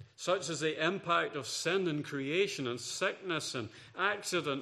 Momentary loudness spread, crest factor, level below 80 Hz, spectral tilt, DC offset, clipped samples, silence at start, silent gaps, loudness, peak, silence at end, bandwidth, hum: 5 LU; 20 dB; -80 dBFS; -3.5 dB/octave; under 0.1%; under 0.1%; 0 s; none; -34 LUFS; -14 dBFS; 0 s; 14 kHz; none